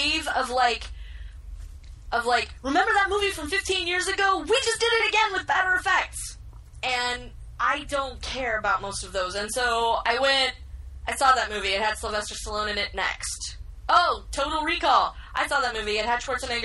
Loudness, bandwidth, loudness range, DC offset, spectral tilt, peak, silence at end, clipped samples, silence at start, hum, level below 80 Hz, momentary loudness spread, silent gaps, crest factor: -24 LUFS; 12.5 kHz; 4 LU; under 0.1%; -2 dB/octave; -8 dBFS; 0 s; under 0.1%; 0 s; none; -42 dBFS; 15 LU; none; 18 dB